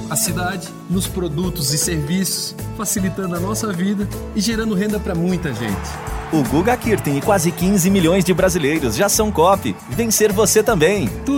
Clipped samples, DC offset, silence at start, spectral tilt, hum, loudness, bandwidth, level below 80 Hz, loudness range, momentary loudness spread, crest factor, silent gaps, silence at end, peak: under 0.1%; under 0.1%; 0 s; -4.5 dB/octave; none; -18 LUFS; 17 kHz; -34 dBFS; 5 LU; 9 LU; 16 dB; none; 0 s; -2 dBFS